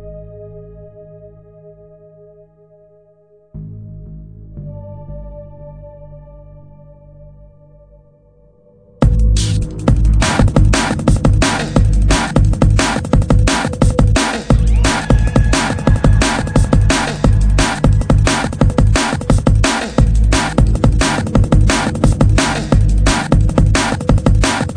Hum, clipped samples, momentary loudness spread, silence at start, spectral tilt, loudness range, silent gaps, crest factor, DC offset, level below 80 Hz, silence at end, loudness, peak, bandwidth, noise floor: none; under 0.1%; 20 LU; 0 s; -5.5 dB/octave; 20 LU; none; 14 dB; under 0.1%; -18 dBFS; 0 s; -14 LUFS; 0 dBFS; 10.5 kHz; -50 dBFS